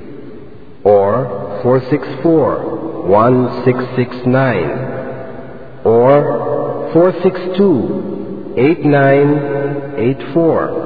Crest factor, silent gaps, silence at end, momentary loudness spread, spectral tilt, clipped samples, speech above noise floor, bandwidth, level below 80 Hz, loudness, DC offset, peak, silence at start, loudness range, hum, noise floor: 14 dB; none; 0 s; 13 LU; -11 dB/octave; under 0.1%; 23 dB; 5 kHz; -48 dBFS; -14 LUFS; 2%; 0 dBFS; 0 s; 2 LU; none; -36 dBFS